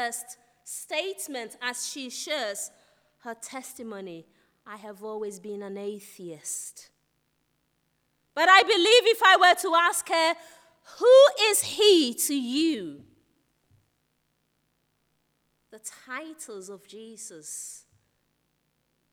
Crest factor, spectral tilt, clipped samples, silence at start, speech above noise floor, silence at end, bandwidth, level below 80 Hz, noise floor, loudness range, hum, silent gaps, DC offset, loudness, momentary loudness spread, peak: 22 dB; -1 dB/octave; under 0.1%; 0 s; 49 dB; 1.35 s; over 20 kHz; -80 dBFS; -74 dBFS; 21 LU; none; none; under 0.1%; -22 LUFS; 24 LU; -4 dBFS